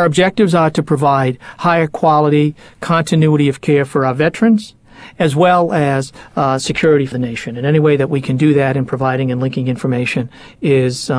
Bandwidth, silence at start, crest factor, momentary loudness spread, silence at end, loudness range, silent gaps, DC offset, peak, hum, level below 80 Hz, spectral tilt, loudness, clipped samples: 11 kHz; 0 s; 12 dB; 8 LU; 0 s; 2 LU; none; under 0.1%; -2 dBFS; none; -48 dBFS; -6.5 dB/octave; -14 LUFS; under 0.1%